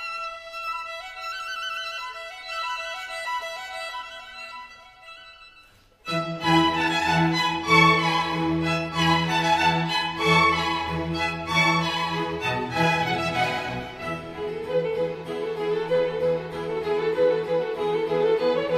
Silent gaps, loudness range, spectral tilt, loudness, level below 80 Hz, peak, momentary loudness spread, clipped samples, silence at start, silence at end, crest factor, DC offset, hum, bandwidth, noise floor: none; 11 LU; -5 dB/octave; -24 LUFS; -52 dBFS; -4 dBFS; 13 LU; under 0.1%; 0 s; 0 s; 20 dB; under 0.1%; none; 14.5 kHz; -54 dBFS